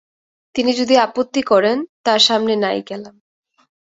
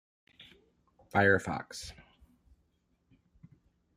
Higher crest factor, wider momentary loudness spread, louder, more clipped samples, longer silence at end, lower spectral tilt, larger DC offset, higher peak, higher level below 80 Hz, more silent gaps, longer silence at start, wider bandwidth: second, 18 dB vs 24 dB; second, 12 LU vs 18 LU; first, -16 LUFS vs -30 LUFS; neither; second, 0.75 s vs 2.05 s; second, -3 dB/octave vs -5.5 dB/octave; neither; first, 0 dBFS vs -12 dBFS; about the same, -62 dBFS vs -64 dBFS; first, 1.89-2.04 s vs none; second, 0.55 s vs 1.15 s; second, 8 kHz vs 15 kHz